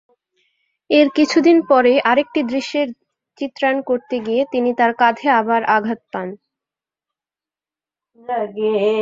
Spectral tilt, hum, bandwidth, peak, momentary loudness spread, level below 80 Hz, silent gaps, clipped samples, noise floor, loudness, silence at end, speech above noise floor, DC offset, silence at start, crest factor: -4.5 dB/octave; none; 7.6 kHz; -2 dBFS; 13 LU; -66 dBFS; none; under 0.1%; under -90 dBFS; -17 LUFS; 0 s; over 74 dB; under 0.1%; 0.9 s; 16 dB